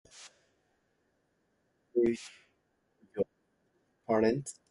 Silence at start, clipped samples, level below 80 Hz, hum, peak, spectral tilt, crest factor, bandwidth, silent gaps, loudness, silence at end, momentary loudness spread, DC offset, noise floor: 0.15 s; under 0.1%; -70 dBFS; none; -14 dBFS; -6 dB/octave; 22 dB; 11.5 kHz; none; -32 LUFS; 0.2 s; 23 LU; under 0.1%; -76 dBFS